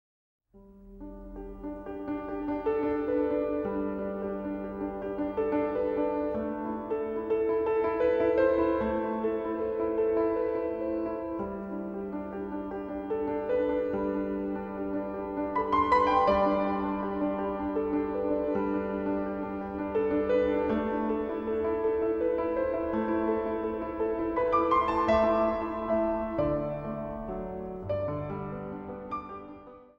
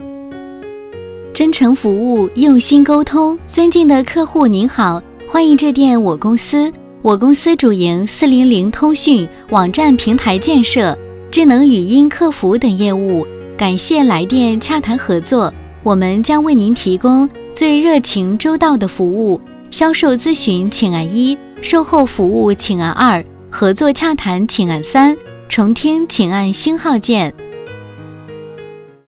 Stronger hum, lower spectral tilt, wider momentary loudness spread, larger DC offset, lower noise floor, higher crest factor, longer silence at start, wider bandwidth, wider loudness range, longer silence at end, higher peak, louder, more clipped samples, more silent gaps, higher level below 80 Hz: neither; second, -8.5 dB/octave vs -11 dB/octave; about the same, 11 LU vs 11 LU; neither; first, -53 dBFS vs -34 dBFS; first, 18 dB vs 12 dB; first, 0.55 s vs 0 s; first, 6.6 kHz vs 4 kHz; about the same, 5 LU vs 3 LU; about the same, 0.15 s vs 0.25 s; second, -12 dBFS vs 0 dBFS; second, -30 LUFS vs -12 LUFS; neither; neither; second, -50 dBFS vs -42 dBFS